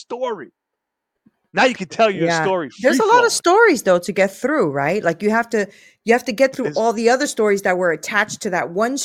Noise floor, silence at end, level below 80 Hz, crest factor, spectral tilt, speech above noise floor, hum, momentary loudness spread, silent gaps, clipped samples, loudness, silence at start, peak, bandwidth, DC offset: -80 dBFS; 0 s; -64 dBFS; 18 dB; -4 dB/octave; 62 dB; none; 9 LU; none; under 0.1%; -17 LUFS; 0.1 s; 0 dBFS; 16 kHz; under 0.1%